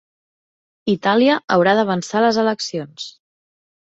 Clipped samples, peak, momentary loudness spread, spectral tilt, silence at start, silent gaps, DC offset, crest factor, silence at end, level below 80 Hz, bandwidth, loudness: under 0.1%; -2 dBFS; 15 LU; -5 dB/octave; 0.85 s; 1.44-1.48 s; under 0.1%; 18 dB; 0.75 s; -62 dBFS; 8.2 kHz; -18 LUFS